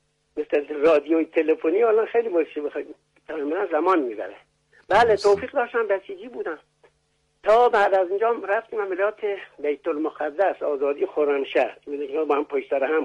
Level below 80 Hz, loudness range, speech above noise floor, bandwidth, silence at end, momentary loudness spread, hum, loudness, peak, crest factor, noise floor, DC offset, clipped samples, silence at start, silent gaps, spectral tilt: -62 dBFS; 3 LU; 46 dB; 11 kHz; 0 s; 14 LU; none; -23 LUFS; -8 dBFS; 14 dB; -69 dBFS; under 0.1%; under 0.1%; 0.35 s; none; -5 dB/octave